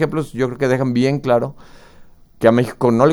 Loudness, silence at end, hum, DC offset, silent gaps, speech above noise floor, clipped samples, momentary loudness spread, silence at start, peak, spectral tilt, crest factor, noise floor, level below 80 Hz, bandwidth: -17 LUFS; 0 s; none; under 0.1%; none; 27 dB; under 0.1%; 6 LU; 0 s; 0 dBFS; -7.5 dB/octave; 18 dB; -43 dBFS; -48 dBFS; 12.5 kHz